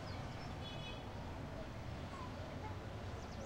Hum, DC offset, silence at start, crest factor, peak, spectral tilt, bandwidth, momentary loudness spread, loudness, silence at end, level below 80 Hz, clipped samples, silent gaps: none; under 0.1%; 0 s; 12 dB; -34 dBFS; -6 dB/octave; 16 kHz; 1 LU; -48 LUFS; 0 s; -56 dBFS; under 0.1%; none